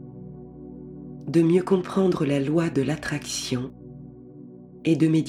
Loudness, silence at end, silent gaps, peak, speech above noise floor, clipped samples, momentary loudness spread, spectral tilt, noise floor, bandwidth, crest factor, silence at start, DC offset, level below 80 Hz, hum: -24 LUFS; 0 s; none; -8 dBFS; 22 dB; under 0.1%; 23 LU; -6 dB/octave; -44 dBFS; 14.5 kHz; 16 dB; 0 s; under 0.1%; -54 dBFS; 60 Hz at -50 dBFS